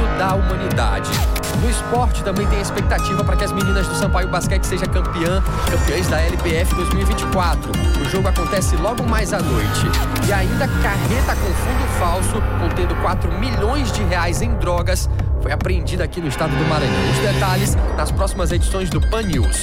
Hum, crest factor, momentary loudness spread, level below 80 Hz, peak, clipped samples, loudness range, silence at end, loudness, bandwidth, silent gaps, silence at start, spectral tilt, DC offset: none; 10 dB; 2 LU; -22 dBFS; -8 dBFS; under 0.1%; 1 LU; 0 s; -19 LUFS; 16.5 kHz; none; 0 s; -5 dB/octave; under 0.1%